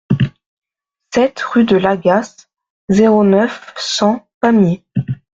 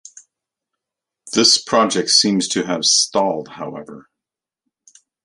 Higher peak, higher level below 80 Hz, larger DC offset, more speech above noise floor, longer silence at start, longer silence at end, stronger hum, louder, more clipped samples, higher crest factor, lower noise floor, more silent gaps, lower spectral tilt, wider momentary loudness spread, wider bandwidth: about the same, -2 dBFS vs 0 dBFS; first, -48 dBFS vs -64 dBFS; neither; second, 65 dB vs 69 dB; second, 0.1 s vs 1.25 s; second, 0.25 s vs 1.25 s; neither; about the same, -14 LUFS vs -15 LUFS; neither; second, 14 dB vs 20 dB; second, -78 dBFS vs -87 dBFS; first, 0.46-0.62 s, 2.70-2.88 s, 4.34-4.41 s vs none; first, -6 dB/octave vs -2 dB/octave; second, 9 LU vs 18 LU; second, 7.8 kHz vs 11.5 kHz